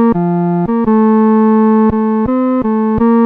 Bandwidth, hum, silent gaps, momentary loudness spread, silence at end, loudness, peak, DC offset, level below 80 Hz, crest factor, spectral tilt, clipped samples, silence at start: 3.2 kHz; none; none; 4 LU; 0 s; -11 LUFS; -2 dBFS; under 0.1%; -36 dBFS; 8 dB; -12 dB/octave; under 0.1%; 0 s